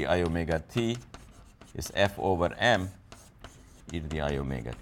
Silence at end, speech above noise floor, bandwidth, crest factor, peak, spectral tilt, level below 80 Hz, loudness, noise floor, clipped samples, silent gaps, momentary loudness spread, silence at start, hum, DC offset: 0 s; 23 dB; 17.5 kHz; 20 dB; -12 dBFS; -5.5 dB/octave; -46 dBFS; -30 LUFS; -52 dBFS; under 0.1%; none; 25 LU; 0 s; none; under 0.1%